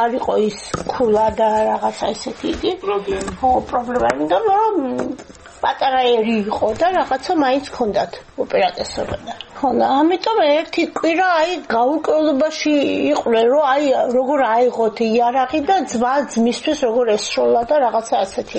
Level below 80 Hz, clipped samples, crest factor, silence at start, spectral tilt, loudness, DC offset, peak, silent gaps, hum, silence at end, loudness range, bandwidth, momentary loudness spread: -46 dBFS; under 0.1%; 16 dB; 0 s; -4.5 dB/octave; -18 LUFS; under 0.1%; 0 dBFS; none; none; 0 s; 3 LU; 8.8 kHz; 8 LU